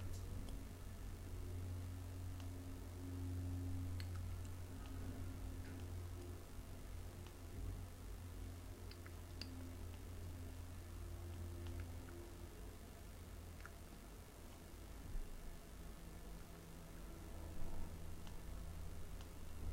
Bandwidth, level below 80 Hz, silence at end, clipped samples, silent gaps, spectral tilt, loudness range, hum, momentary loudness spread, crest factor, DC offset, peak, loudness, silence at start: 16 kHz; -54 dBFS; 0 s; under 0.1%; none; -6 dB/octave; 7 LU; none; 8 LU; 18 dB; under 0.1%; -32 dBFS; -53 LUFS; 0 s